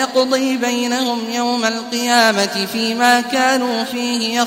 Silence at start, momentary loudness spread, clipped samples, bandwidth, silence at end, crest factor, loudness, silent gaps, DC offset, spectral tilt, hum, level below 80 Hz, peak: 0 s; 6 LU; under 0.1%; 16 kHz; 0 s; 16 dB; -16 LUFS; none; under 0.1%; -2.5 dB/octave; none; -66 dBFS; 0 dBFS